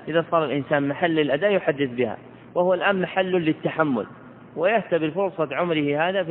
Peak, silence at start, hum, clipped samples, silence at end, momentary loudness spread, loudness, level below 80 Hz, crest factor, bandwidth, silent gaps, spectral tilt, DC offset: -4 dBFS; 0 s; none; under 0.1%; 0 s; 6 LU; -23 LUFS; -66 dBFS; 18 dB; 4.1 kHz; none; -10 dB/octave; under 0.1%